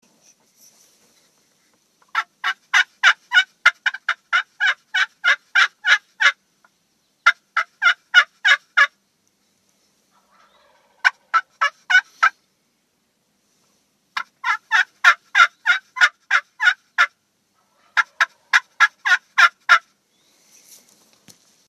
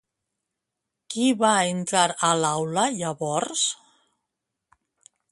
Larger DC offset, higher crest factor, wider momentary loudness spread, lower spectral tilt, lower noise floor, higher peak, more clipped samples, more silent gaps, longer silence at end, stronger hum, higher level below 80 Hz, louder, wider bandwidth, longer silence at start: neither; about the same, 22 dB vs 22 dB; about the same, 9 LU vs 7 LU; second, 4 dB/octave vs -3 dB/octave; second, -68 dBFS vs -84 dBFS; first, 0 dBFS vs -4 dBFS; neither; neither; first, 1.9 s vs 1.55 s; neither; second, -90 dBFS vs -70 dBFS; first, -18 LUFS vs -23 LUFS; first, 13.5 kHz vs 11.5 kHz; first, 2.15 s vs 1.1 s